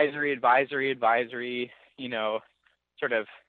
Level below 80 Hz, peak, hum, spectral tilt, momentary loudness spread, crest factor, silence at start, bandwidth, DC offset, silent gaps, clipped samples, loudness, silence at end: -82 dBFS; -10 dBFS; none; -7.5 dB/octave; 12 LU; 20 dB; 0 s; 4.5 kHz; under 0.1%; none; under 0.1%; -27 LUFS; 0.1 s